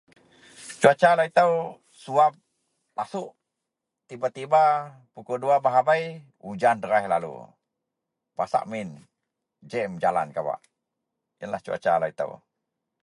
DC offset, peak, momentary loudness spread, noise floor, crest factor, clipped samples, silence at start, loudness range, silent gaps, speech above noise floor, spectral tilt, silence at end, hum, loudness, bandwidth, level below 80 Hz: under 0.1%; -2 dBFS; 20 LU; -84 dBFS; 24 dB; under 0.1%; 0.6 s; 7 LU; none; 61 dB; -5 dB/octave; 0.65 s; none; -24 LUFS; 11.5 kHz; -70 dBFS